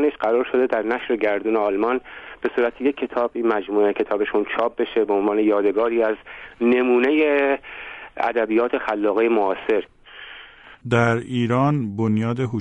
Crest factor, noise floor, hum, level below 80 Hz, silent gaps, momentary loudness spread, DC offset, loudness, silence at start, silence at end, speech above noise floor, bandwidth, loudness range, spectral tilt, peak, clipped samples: 16 dB; -44 dBFS; none; -56 dBFS; none; 12 LU; under 0.1%; -21 LUFS; 0 s; 0 s; 23 dB; 8.8 kHz; 3 LU; -8 dB/octave; -6 dBFS; under 0.1%